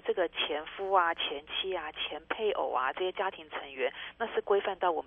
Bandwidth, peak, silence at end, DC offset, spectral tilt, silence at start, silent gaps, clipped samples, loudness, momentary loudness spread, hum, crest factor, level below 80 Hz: 3.7 kHz; -12 dBFS; 0 s; under 0.1%; -5.5 dB/octave; 0.05 s; none; under 0.1%; -32 LUFS; 8 LU; 60 Hz at -75 dBFS; 20 dB; -66 dBFS